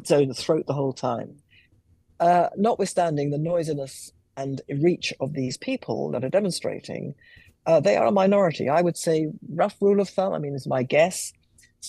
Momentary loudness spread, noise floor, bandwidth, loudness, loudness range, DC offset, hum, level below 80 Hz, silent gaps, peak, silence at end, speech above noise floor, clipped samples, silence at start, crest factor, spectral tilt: 13 LU; -61 dBFS; 12.5 kHz; -24 LUFS; 5 LU; under 0.1%; none; -66 dBFS; none; -8 dBFS; 0 s; 37 dB; under 0.1%; 0 s; 16 dB; -5.5 dB/octave